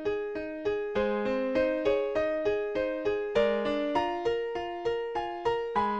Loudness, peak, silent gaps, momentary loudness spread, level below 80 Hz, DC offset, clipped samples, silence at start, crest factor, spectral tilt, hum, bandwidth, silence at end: -30 LUFS; -12 dBFS; none; 5 LU; -54 dBFS; 0.1%; under 0.1%; 0 s; 16 dB; -6 dB/octave; none; 8 kHz; 0 s